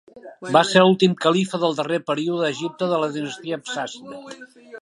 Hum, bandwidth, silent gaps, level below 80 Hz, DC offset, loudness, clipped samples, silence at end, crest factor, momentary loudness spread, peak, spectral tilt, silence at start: none; 11.5 kHz; none; -72 dBFS; under 0.1%; -20 LUFS; under 0.1%; 0 s; 20 dB; 21 LU; 0 dBFS; -5 dB/octave; 0.15 s